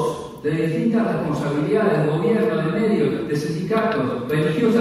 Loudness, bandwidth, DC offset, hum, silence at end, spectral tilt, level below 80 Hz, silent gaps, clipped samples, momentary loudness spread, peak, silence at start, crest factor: -21 LUFS; 14.5 kHz; under 0.1%; none; 0 s; -7.5 dB/octave; -54 dBFS; none; under 0.1%; 5 LU; -6 dBFS; 0 s; 14 dB